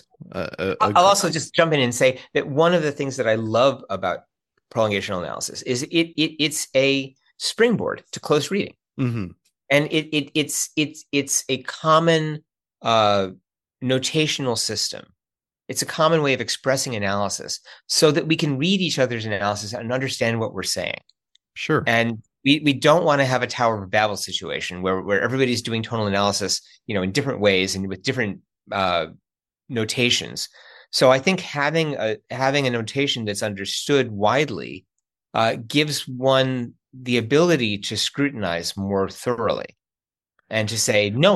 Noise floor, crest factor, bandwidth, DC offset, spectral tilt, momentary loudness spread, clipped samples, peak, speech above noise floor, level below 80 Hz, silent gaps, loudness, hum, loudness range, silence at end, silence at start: under -90 dBFS; 20 dB; 12.5 kHz; under 0.1%; -4 dB/octave; 11 LU; under 0.1%; -2 dBFS; over 69 dB; -62 dBFS; none; -21 LUFS; none; 3 LU; 0 s; 0.2 s